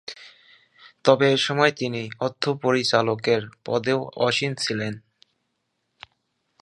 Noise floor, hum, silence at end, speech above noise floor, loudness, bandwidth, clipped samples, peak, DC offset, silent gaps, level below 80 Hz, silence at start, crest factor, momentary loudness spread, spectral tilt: -75 dBFS; none; 1.6 s; 53 dB; -23 LUFS; 11.5 kHz; under 0.1%; 0 dBFS; under 0.1%; none; -66 dBFS; 0.1 s; 24 dB; 10 LU; -4.5 dB/octave